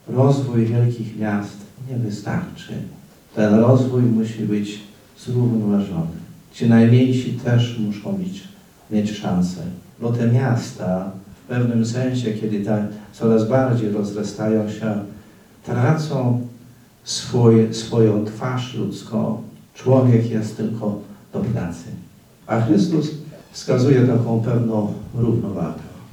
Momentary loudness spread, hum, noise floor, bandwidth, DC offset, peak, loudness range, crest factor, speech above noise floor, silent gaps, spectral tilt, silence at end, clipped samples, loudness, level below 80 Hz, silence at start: 17 LU; none; -46 dBFS; 11 kHz; under 0.1%; -2 dBFS; 4 LU; 18 dB; 27 dB; none; -7.5 dB/octave; 0.05 s; under 0.1%; -20 LUFS; -58 dBFS; 0.05 s